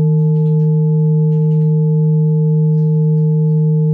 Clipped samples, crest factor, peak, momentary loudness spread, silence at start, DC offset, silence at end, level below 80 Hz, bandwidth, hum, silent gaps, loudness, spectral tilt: under 0.1%; 6 dB; -8 dBFS; 0 LU; 0 s; under 0.1%; 0 s; -62 dBFS; 0.9 kHz; none; none; -13 LUFS; -14.5 dB/octave